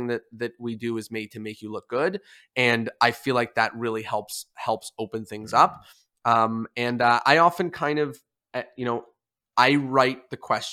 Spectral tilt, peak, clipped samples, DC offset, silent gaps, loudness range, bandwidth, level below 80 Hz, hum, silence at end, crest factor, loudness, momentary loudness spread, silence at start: -4.5 dB/octave; -2 dBFS; under 0.1%; under 0.1%; none; 4 LU; 16 kHz; -70 dBFS; none; 0 s; 24 dB; -24 LUFS; 15 LU; 0 s